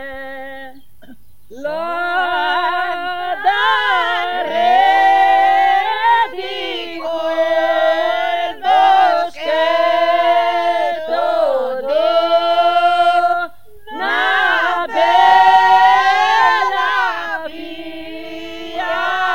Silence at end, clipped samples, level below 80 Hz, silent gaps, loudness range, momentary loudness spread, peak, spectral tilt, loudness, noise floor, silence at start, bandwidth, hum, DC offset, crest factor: 0 s; under 0.1%; -56 dBFS; none; 5 LU; 17 LU; 0 dBFS; -2.5 dB/octave; -14 LUFS; -45 dBFS; 0 s; 16.5 kHz; none; 2%; 14 dB